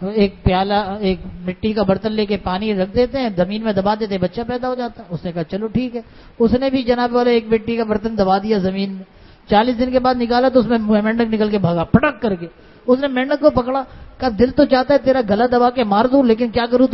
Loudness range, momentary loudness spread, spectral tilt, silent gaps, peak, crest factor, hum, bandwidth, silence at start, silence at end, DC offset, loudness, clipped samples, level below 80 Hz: 5 LU; 10 LU; -9 dB/octave; none; 0 dBFS; 16 dB; none; 6 kHz; 0 s; 0 s; under 0.1%; -17 LUFS; under 0.1%; -38 dBFS